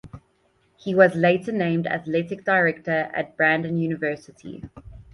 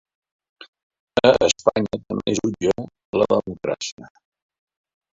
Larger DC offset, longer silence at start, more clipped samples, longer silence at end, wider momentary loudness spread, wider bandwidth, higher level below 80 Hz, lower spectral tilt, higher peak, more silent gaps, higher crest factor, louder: neither; second, 0.05 s vs 0.6 s; neither; second, 0.1 s vs 1.05 s; first, 20 LU vs 11 LU; first, 11 kHz vs 8 kHz; about the same, -56 dBFS vs -52 dBFS; first, -7.5 dB/octave vs -4 dB/octave; about the same, -2 dBFS vs -2 dBFS; second, none vs 0.68-0.73 s, 0.83-0.90 s, 1.00-1.07 s, 3.05-3.13 s, 3.92-3.98 s; about the same, 20 dB vs 22 dB; about the same, -22 LUFS vs -21 LUFS